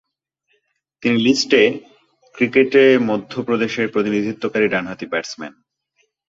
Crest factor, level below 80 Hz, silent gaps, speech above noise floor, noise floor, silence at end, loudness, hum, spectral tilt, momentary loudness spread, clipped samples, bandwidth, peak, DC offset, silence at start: 18 dB; -60 dBFS; none; 53 dB; -70 dBFS; 0.8 s; -17 LUFS; none; -4.5 dB/octave; 12 LU; under 0.1%; 7.8 kHz; -2 dBFS; under 0.1%; 1 s